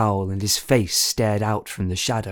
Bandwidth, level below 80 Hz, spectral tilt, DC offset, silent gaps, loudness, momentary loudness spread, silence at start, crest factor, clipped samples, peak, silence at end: over 20 kHz; -48 dBFS; -4 dB/octave; under 0.1%; none; -21 LUFS; 6 LU; 0 s; 18 dB; under 0.1%; -4 dBFS; 0 s